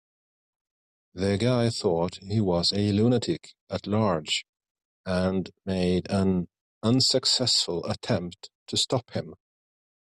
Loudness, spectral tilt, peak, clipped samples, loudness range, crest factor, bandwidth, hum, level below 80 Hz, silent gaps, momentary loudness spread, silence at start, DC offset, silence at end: -26 LUFS; -5 dB/octave; -10 dBFS; under 0.1%; 3 LU; 16 dB; 12 kHz; none; -60 dBFS; 3.61-3.67 s, 4.49-4.53 s, 4.71-4.75 s, 4.85-5.04 s, 6.61-6.81 s, 8.55-8.66 s; 14 LU; 1.15 s; under 0.1%; 0.85 s